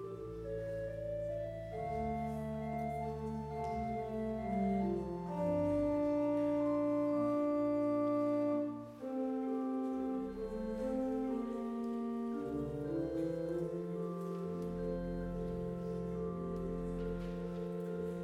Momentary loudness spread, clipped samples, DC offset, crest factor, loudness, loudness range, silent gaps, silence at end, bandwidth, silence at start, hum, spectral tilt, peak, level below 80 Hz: 7 LU; under 0.1%; under 0.1%; 12 dB; -38 LUFS; 6 LU; none; 0 s; 13 kHz; 0 s; none; -9 dB/octave; -24 dBFS; -56 dBFS